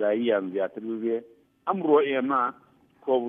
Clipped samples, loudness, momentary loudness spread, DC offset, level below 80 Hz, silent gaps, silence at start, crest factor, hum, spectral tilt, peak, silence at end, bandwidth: under 0.1%; -26 LUFS; 10 LU; under 0.1%; -80 dBFS; none; 0 s; 18 dB; none; -8.5 dB/octave; -10 dBFS; 0 s; 3.8 kHz